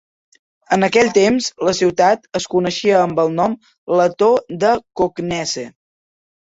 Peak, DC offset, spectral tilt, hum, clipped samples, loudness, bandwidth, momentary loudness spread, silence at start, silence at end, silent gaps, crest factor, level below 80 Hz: -2 dBFS; under 0.1%; -4.5 dB/octave; none; under 0.1%; -17 LUFS; 8 kHz; 8 LU; 0.7 s; 0.85 s; 3.78-3.87 s; 16 dB; -54 dBFS